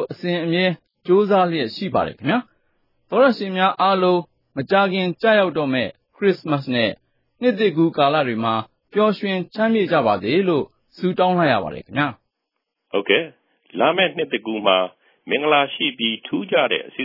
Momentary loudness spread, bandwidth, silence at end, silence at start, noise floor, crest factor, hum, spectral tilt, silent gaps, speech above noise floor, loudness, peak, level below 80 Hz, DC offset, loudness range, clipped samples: 8 LU; 5.8 kHz; 0 s; 0 s; -78 dBFS; 18 dB; none; -8 dB/octave; none; 59 dB; -20 LUFS; 0 dBFS; -64 dBFS; under 0.1%; 2 LU; under 0.1%